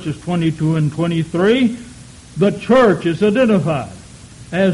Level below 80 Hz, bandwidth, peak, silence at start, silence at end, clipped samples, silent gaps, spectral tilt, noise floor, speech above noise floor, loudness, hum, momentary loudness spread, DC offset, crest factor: -46 dBFS; 11.5 kHz; -4 dBFS; 0 s; 0 s; under 0.1%; none; -7 dB/octave; -38 dBFS; 23 dB; -16 LUFS; none; 13 LU; under 0.1%; 12 dB